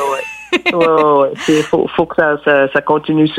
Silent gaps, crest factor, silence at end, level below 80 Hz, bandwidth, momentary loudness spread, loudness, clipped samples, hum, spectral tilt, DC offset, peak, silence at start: none; 12 dB; 0 s; -50 dBFS; 13.5 kHz; 5 LU; -13 LUFS; under 0.1%; none; -5.5 dB/octave; under 0.1%; -2 dBFS; 0 s